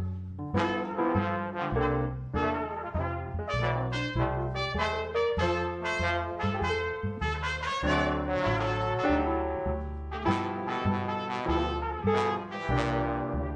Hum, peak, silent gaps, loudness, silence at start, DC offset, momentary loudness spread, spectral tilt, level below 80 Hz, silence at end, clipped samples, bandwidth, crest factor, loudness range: none; -12 dBFS; none; -30 LUFS; 0 s; under 0.1%; 5 LU; -6.5 dB/octave; -42 dBFS; 0 s; under 0.1%; 9.8 kHz; 16 dB; 2 LU